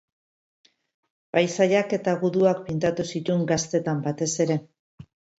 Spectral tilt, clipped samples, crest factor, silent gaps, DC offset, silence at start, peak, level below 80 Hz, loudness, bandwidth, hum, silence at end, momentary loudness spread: -5.5 dB/octave; under 0.1%; 18 dB; 4.79-4.98 s; under 0.1%; 1.35 s; -8 dBFS; -62 dBFS; -24 LUFS; 8.2 kHz; none; 0.35 s; 5 LU